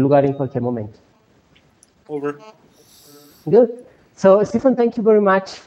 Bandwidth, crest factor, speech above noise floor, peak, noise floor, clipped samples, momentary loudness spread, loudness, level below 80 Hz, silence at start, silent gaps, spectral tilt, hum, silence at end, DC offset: 14 kHz; 18 dB; 39 dB; 0 dBFS; -55 dBFS; under 0.1%; 18 LU; -17 LUFS; -58 dBFS; 0 s; none; -7.5 dB/octave; none; 0.1 s; under 0.1%